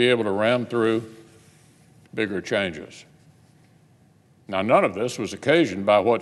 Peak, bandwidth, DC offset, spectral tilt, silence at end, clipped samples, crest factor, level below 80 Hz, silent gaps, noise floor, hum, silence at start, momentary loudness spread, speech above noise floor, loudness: -4 dBFS; 12.5 kHz; under 0.1%; -5.5 dB/octave; 0 s; under 0.1%; 20 dB; -66 dBFS; none; -57 dBFS; none; 0 s; 12 LU; 35 dB; -22 LUFS